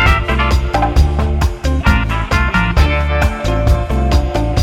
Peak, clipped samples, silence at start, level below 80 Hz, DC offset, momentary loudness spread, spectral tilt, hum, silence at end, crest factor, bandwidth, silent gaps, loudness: 0 dBFS; under 0.1%; 0 s; -16 dBFS; under 0.1%; 3 LU; -6 dB/octave; none; 0 s; 12 dB; 13.5 kHz; none; -15 LUFS